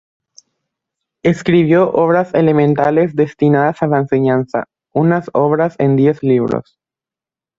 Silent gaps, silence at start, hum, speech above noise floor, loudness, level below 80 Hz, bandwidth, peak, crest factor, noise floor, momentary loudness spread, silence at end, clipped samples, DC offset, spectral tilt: none; 1.25 s; none; 76 dB; -14 LUFS; -52 dBFS; 7.8 kHz; -2 dBFS; 14 dB; -89 dBFS; 6 LU; 0.95 s; under 0.1%; under 0.1%; -8.5 dB/octave